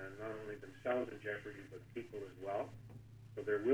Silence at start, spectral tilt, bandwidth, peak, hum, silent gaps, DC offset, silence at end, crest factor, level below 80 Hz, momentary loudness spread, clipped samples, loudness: 0 s; -7 dB/octave; 18 kHz; -20 dBFS; none; none; under 0.1%; 0 s; 22 dB; -70 dBFS; 14 LU; under 0.1%; -44 LUFS